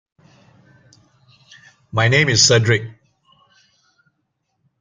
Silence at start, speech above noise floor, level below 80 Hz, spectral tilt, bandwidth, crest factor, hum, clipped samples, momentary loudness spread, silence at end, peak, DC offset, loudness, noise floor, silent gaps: 1.95 s; 57 dB; -56 dBFS; -3 dB/octave; 9.6 kHz; 20 dB; none; under 0.1%; 13 LU; 1.9 s; -2 dBFS; under 0.1%; -15 LUFS; -72 dBFS; none